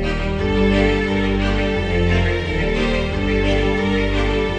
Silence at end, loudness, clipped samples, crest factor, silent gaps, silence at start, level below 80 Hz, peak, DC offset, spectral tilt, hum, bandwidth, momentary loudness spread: 0 s; -19 LUFS; under 0.1%; 14 dB; none; 0 s; -24 dBFS; -2 dBFS; under 0.1%; -6.5 dB/octave; none; 9.2 kHz; 4 LU